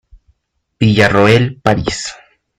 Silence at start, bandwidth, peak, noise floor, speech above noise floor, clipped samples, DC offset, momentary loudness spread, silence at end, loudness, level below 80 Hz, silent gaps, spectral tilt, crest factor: 0.8 s; 11.5 kHz; 0 dBFS; -63 dBFS; 51 dB; under 0.1%; under 0.1%; 12 LU; 0.45 s; -12 LUFS; -40 dBFS; none; -5.5 dB/octave; 14 dB